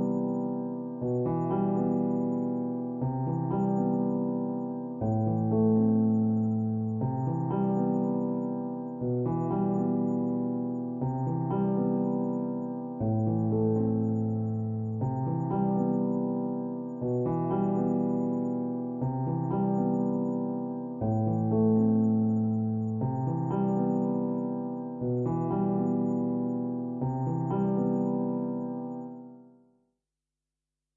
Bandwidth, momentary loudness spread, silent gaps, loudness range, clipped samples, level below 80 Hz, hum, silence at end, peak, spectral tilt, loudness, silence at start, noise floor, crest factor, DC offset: 3 kHz; 7 LU; none; 3 LU; under 0.1%; -60 dBFS; none; 1.55 s; -16 dBFS; -12.5 dB/octave; -29 LUFS; 0 s; -89 dBFS; 14 dB; under 0.1%